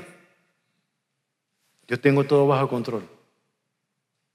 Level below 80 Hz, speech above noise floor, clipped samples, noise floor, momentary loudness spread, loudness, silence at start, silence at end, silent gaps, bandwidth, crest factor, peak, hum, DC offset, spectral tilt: -76 dBFS; 58 dB; under 0.1%; -79 dBFS; 13 LU; -22 LUFS; 0 s; 1.3 s; none; 12.5 kHz; 22 dB; -6 dBFS; none; under 0.1%; -8 dB/octave